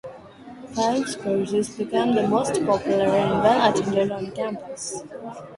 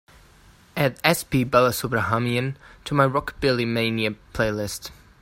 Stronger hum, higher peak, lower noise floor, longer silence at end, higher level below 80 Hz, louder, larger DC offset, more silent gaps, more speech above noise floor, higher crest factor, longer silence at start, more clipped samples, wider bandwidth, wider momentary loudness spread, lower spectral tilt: neither; about the same, -4 dBFS vs -2 dBFS; second, -42 dBFS vs -52 dBFS; second, 0 s vs 0.3 s; second, -56 dBFS vs -48 dBFS; about the same, -22 LUFS vs -23 LUFS; neither; neither; second, 20 dB vs 30 dB; about the same, 18 dB vs 22 dB; second, 0.05 s vs 0.75 s; neither; second, 11.5 kHz vs 16 kHz; about the same, 14 LU vs 12 LU; about the same, -5 dB/octave vs -5 dB/octave